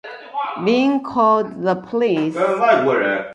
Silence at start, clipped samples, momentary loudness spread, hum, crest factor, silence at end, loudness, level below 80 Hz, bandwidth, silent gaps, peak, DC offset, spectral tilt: 0.05 s; under 0.1%; 7 LU; none; 16 dB; 0 s; -18 LUFS; -64 dBFS; 11 kHz; none; -2 dBFS; under 0.1%; -6.5 dB/octave